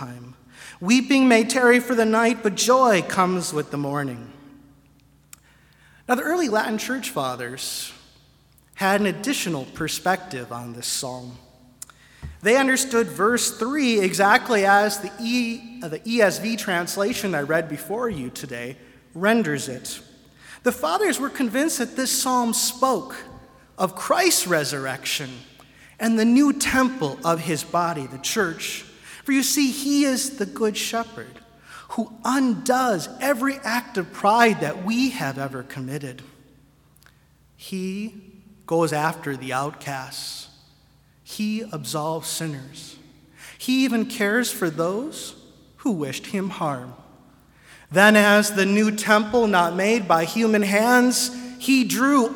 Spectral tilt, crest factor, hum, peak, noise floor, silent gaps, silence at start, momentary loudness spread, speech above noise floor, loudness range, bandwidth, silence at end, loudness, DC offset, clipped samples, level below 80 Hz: -3.5 dB/octave; 22 dB; none; 0 dBFS; -57 dBFS; none; 0 s; 16 LU; 35 dB; 9 LU; 18 kHz; 0 s; -21 LUFS; under 0.1%; under 0.1%; -58 dBFS